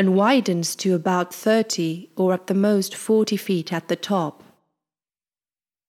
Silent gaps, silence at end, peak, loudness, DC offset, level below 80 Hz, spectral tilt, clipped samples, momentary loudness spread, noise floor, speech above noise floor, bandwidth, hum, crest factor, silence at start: none; 1.6 s; -6 dBFS; -22 LUFS; under 0.1%; -76 dBFS; -5 dB/octave; under 0.1%; 6 LU; under -90 dBFS; over 69 dB; 15.5 kHz; none; 16 dB; 0 s